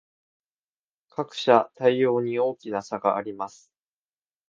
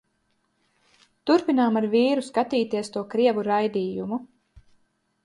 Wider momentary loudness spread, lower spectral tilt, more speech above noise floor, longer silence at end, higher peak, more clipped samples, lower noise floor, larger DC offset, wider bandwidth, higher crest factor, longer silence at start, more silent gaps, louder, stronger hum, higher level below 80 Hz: first, 14 LU vs 9 LU; about the same, -5.5 dB/octave vs -6 dB/octave; first, over 66 dB vs 48 dB; about the same, 1 s vs 1 s; first, -2 dBFS vs -8 dBFS; neither; first, under -90 dBFS vs -71 dBFS; neither; second, 7.6 kHz vs 11.5 kHz; first, 24 dB vs 16 dB; about the same, 1.2 s vs 1.25 s; neither; about the same, -24 LUFS vs -24 LUFS; neither; second, -74 dBFS vs -66 dBFS